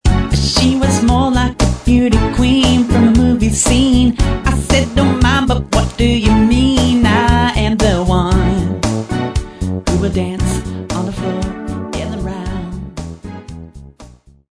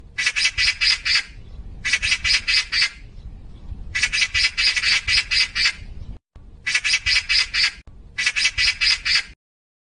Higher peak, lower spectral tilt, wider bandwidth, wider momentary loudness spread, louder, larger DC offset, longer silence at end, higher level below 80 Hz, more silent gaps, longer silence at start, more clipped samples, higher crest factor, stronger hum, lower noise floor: first, 0 dBFS vs -4 dBFS; first, -5.5 dB/octave vs 1 dB/octave; about the same, 11 kHz vs 10.5 kHz; first, 12 LU vs 7 LU; first, -14 LUFS vs -18 LUFS; second, under 0.1% vs 0.1%; second, 0.45 s vs 0.65 s; first, -20 dBFS vs -40 dBFS; neither; about the same, 0.05 s vs 0.05 s; neither; about the same, 14 dB vs 18 dB; neither; about the same, -40 dBFS vs -43 dBFS